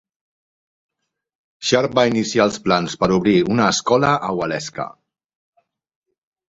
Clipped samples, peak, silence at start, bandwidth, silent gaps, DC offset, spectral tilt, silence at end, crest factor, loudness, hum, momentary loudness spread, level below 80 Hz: under 0.1%; -2 dBFS; 1.6 s; 8 kHz; none; under 0.1%; -4.5 dB/octave; 1.65 s; 18 dB; -18 LUFS; none; 10 LU; -52 dBFS